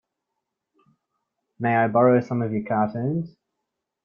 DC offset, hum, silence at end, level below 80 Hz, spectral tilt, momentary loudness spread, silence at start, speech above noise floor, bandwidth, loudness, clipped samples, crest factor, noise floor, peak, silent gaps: under 0.1%; none; 0.75 s; -66 dBFS; -10 dB/octave; 10 LU; 1.6 s; 60 dB; 6.8 kHz; -22 LUFS; under 0.1%; 20 dB; -82 dBFS; -6 dBFS; none